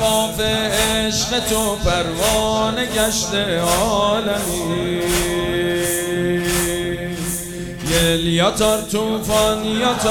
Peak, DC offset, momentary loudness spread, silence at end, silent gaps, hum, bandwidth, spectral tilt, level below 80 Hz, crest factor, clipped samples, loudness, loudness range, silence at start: -4 dBFS; 0.2%; 5 LU; 0 s; none; none; 19 kHz; -3.5 dB/octave; -34 dBFS; 14 dB; under 0.1%; -18 LUFS; 2 LU; 0 s